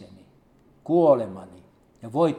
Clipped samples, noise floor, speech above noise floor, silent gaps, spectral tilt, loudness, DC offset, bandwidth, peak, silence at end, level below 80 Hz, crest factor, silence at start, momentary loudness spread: under 0.1%; -58 dBFS; 36 dB; none; -8.5 dB/octave; -22 LUFS; under 0.1%; 9.8 kHz; -6 dBFS; 0 s; -66 dBFS; 18 dB; 0 s; 25 LU